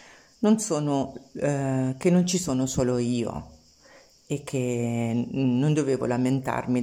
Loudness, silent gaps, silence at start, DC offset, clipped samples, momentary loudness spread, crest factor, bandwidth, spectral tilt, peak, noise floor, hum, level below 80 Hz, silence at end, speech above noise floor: -26 LUFS; none; 0.4 s; under 0.1%; under 0.1%; 8 LU; 16 dB; 16 kHz; -6 dB/octave; -10 dBFS; -54 dBFS; none; -54 dBFS; 0 s; 30 dB